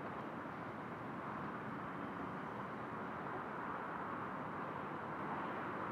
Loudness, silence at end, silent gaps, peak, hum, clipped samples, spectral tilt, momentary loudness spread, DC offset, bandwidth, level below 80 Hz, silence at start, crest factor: -45 LUFS; 0 s; none; -30 dBFS; none; under 0.1%; -7.5 dB/octave; 3 LU; under 0.1%; 14.5 kHz; -74 dBFS; 0 s; 14 dB